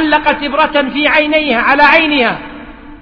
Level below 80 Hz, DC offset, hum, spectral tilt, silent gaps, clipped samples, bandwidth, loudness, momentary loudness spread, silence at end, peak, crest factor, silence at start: -38 dBFS; under 0.1%; none; -5.5 dB/octave; none; 0.2%; 5.4 kHz; -10 LUFS; 8 LU; 0.05 s; 0 dBFS; 12 dB; 0 s